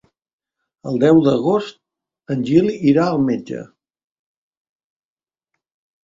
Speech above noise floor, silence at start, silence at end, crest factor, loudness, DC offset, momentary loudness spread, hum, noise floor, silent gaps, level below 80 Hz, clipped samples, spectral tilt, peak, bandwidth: over 74 dB; 0.85 s; 2.4 s; 18 dB; -17 LUFS; under 0.1%; 18 LU; none; under -90 dBFS; none; -58 dBFS; under 0.1%; -8 dB/octave; -2 dBFS; 7.6 kHz